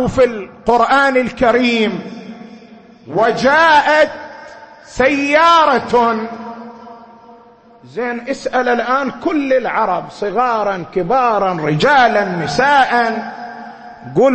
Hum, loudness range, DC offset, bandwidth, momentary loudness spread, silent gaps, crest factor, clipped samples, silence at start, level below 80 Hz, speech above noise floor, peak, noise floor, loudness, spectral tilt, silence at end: none; 6 LU; under 0.1%; 8.8 kHz; 20 LU; none; 14 dB; under 0.1%; 0 s; -46 dBFS; 30 dB; 0 dBFS; -44 dBFS; -14 LUFS; -5 dB/octave; 0 s